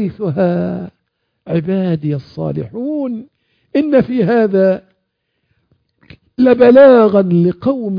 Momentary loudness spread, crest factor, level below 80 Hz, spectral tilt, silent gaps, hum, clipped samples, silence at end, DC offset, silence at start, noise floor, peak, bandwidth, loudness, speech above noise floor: 15 LU; 14 dB; -52 dBFS; -10.5 dB/octave; none; none; under 0.1%; 0 s; under 0.1%; 0 s; -69 dBFS; 0 dBFS; 5.2 kHz; -13 LUFS; 57 dB